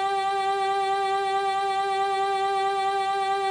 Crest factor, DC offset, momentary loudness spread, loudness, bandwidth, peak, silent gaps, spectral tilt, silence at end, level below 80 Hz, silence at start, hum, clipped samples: 10 dB; under 0.1%; 1 LU; -25 LUFS; 18.5 kHz; -16 dBFS; none; -2 dB/octave; 0 s; -68 dBFS; 0 s; none; under 0.1%